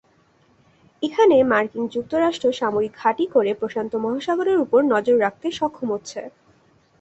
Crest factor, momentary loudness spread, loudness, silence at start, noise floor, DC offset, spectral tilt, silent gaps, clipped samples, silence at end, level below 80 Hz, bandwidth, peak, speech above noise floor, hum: 18 dB; 11 LU; -21 LUFS; 1 s; -59 dBFS; under 0.1%; -5 dB/octave; none; under 0.1%; 0.7 s; -60 dBFS; 8.2 kHz; -4 dBFS; 39 dB; none